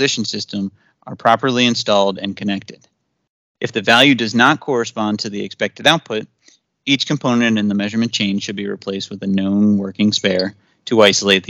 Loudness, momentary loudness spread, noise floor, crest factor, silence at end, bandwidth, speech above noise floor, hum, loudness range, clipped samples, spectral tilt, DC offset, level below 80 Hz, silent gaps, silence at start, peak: -16 LUFS; 13 LU; -55 dBFS; 18 dB; 0.05 s; 13 kHz; 38 dB; none; 3 LU; under 0.1%; -4 dB/octave; under 0.1%; -64 dBFS; 3.29-3.55 s; 0 s; 0 dBFS